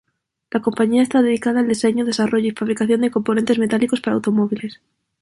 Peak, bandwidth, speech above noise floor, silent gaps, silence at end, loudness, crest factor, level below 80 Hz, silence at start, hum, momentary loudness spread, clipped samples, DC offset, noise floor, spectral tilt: -4 dBFS; 11.5 kHz; 30 dB; none; 0.5 s; -19 LUFS; 14 dB; -60 dBFS; 0.55 s; none; 6 LU; under 0.1%; under 0.1%; -47 dBFS; -5.5 dB/octave